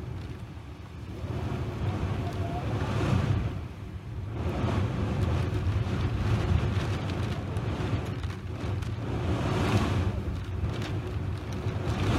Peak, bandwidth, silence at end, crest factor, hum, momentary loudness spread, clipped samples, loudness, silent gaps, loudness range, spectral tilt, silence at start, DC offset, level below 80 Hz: -12 dBFS; 12.5 kHz; 0 s; 16 dB; none; 11 LU; under 0.1%; -31 LUFS; none; 2 LU; -7 dB/octave; 0 s; under 0.1%; -38 dBFS